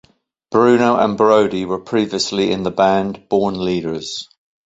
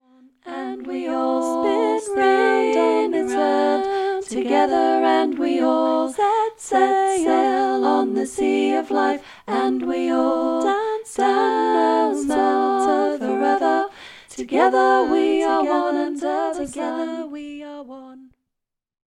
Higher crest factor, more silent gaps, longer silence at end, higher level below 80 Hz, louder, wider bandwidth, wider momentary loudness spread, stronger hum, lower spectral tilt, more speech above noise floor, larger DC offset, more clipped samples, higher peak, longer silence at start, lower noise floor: about the same, 16 dB vs 16 dB; neither; second, 0.45 s vs 0.8 s; first, -52 dBFS vs -60 dBFS; first, -17 LUFS vs -20 LUFS; second, 8.2 kHz vs 12 kHz; about the same, 10 LU vs 11 LU; neither; first, -5 dB/octave vs -3.5 dB/octave; second, 31 dB vs 62 dB; neither; neither; first, 0 dBFS vs -4 dBFS; about the same, 0.5 s vs 0.45 s; second, -47 dBFS vs -82 dBFS